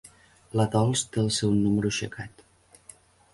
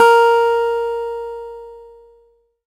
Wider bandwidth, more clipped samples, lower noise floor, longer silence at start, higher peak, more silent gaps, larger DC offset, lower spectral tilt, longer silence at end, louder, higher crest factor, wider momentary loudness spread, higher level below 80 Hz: second, 11.5 kHz vs 15.5 kHz; neither; about the same, -54 dBFS vs -56 dBFS; first, 0.55 s vs 0 s; second, -12 dBFS vs 0 dBFS; neither; neither; first, -5 dB/octave vs -1.5 dB/octave; first, 1.05 s vs 0.85 s; second, -26 LUFS vs -16 LUFS; about the same, 16 dB vs 16 dB; second, 13 LU vs 23 LU; about the same, -54 dBFS vs -54 dBFS